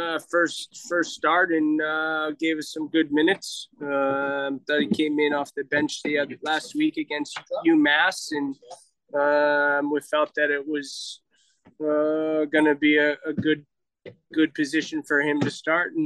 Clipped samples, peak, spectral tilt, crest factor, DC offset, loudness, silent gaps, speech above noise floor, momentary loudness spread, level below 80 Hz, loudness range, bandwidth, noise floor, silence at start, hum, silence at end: under 0.1%; -8 dBFS; -4 dB/octave; 16 dB; under 0.1%; -24 LUFS; none; 36 dB; 10 LU; -74 dBFS; 2 LU; 12.5 kHz; -59 dBFS; 0 s; none; 0 s